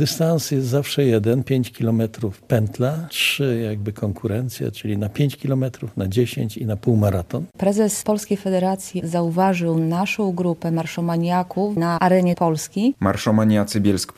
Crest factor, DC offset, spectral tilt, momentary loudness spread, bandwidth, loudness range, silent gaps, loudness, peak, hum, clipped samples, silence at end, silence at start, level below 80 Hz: 18 dB; under 0.1%; -6 dB/octave; 7 LU; 14.5 kHz; 3 LU; none; -21 LUFS; -2 dBFS; none; under 0.1%; 0.05 s; 0 s; -56 dBFS